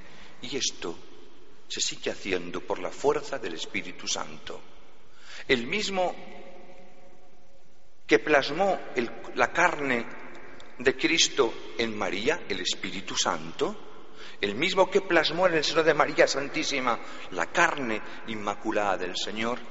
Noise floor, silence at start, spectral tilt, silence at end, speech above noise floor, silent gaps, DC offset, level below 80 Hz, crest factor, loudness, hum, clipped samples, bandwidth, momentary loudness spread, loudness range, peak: -60 dBFS; 0 s; -1.5 dB/octave; 0 s; 33 dB; none; 2%; -58 dBFS; 24 dB; -27 LUFS; none; under 0.1%; 8 kHz; 19 LU; 7 LU; -6 dBFS